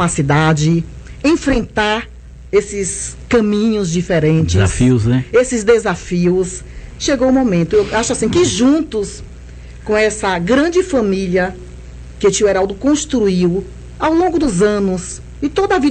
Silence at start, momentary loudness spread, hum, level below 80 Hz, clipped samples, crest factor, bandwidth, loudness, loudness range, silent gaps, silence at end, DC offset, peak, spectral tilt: 0 s; 10 LU; 60 Hz at -35 dBFS; -32 dBFS; under 0.1%; 14 dB; 9.2 kHz; -15 LUFS; 2 LU; none; 0 s; under 0.1%; 0 dBFS; -5.5 dB/octave